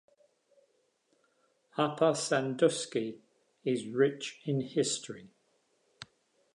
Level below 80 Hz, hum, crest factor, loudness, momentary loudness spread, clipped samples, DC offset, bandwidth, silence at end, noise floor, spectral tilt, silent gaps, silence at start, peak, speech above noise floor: -82 dBFS; none; 22 dB; -31 LUFS; 21 LU; under 0.1%; under 0.1%; 11.5 kHz; 0.5 s; -74 dBFS; -4.5 dB/octave; none; 1.75 s; -12 dBFS; 43 dB